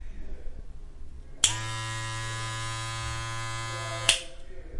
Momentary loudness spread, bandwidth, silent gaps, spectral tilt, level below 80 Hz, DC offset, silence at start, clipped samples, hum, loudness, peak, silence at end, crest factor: 24 LU; 11.5 kHz; none; -1.5 dB/octave; -42 dBFS; under 0.1%; 0 s; under 0.1%; none; -29 LUFS; -2 dBFS; 0 s; 30 dB